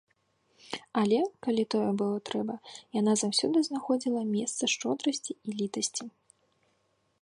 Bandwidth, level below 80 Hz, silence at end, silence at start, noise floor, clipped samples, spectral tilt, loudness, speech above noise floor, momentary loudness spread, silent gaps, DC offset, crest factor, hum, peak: 11.5 kHz; -78 dBFS; 1.15 s; 0.65 s; -73 dBFS; under 0.1%; -4 dB/octave; -30 LUFS; 43 dB; 11 LU; none; under 0.1%; 18 dB; none; -14 dBFS